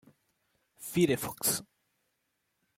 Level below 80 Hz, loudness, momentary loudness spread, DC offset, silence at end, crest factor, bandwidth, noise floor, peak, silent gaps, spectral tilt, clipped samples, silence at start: -66 dBFS; -30 LUFS; 7 LU; under 0.1%; 1.15 s; 22 dB; 16.5 kHz; -80 dBFS; -14 dBFS; none; -4 dB/octave; under 0.1%; 0.8 s